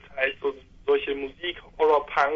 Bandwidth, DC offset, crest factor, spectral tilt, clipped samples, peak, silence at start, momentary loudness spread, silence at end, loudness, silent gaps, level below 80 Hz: 6.8 kHz; under 0.1%; 18 dB; -4.5 dB/octave; under 0.1%; -8 dBFS; 0.1 s; 11 LU; 0 s; -26 LUFS; none; -54 dBFS